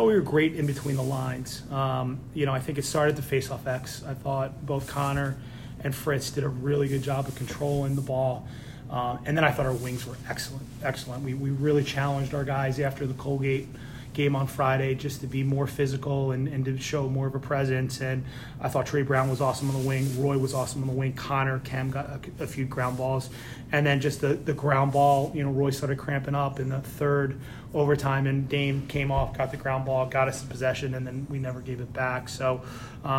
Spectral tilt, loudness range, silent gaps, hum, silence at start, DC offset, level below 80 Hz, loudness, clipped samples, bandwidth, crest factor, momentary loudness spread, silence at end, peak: -6 dB/octave; 4 LU; none; none; 0 s; under 0.1%; -48 dBFS; -28 LUFS; under 0.1%; 16 kHz; 18 dB; 9 LU; 0 s; -10 dBFS